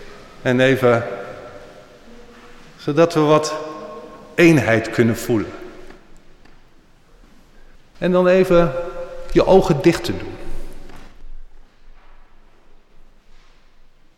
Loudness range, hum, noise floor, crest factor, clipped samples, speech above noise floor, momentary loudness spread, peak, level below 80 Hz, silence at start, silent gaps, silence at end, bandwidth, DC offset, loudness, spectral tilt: 7 LU; none; -48 dBFS; 16 dB; under 0.1%; 33 dB; 23 LU; -4 dBFS; -36 dBFS; 0 s; none; 1.15 s; 16.5 kHz; under 0.1%; -17 LUFS; -6.5 dB/octave